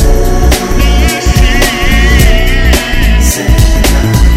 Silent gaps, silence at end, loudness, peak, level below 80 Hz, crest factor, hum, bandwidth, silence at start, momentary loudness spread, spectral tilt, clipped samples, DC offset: none; 0 s; -9 LUFS; 0 dBFS; -8 dBFS; 6 dB; none; 16 kHz; 0 s; 2 LU; -4.5 dB/octave; 4%; under 0.1%